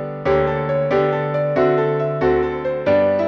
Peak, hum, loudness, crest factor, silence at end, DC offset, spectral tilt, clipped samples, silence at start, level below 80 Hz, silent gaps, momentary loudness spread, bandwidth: -4 dBFS; none; -18 LUFS; 12 dB; 0 s; under 0.1%; -8.5 dB/octave; under 0.1%; 0 s; -42 dBFS; none; 3 LU; 6.4 kHz